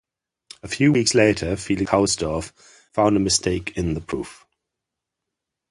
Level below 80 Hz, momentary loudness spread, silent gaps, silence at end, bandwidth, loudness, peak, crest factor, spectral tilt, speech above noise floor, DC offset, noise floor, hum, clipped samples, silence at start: -42 dBFS; 14 LU; none; 1.35 s; 11.5 kHz; -21 LUFS; -2 dBFS; 20 dB; -4.5 dB/octave; 63 dB; under 0.1%; -84 dBFS; none; under 0.1%; 0.65 s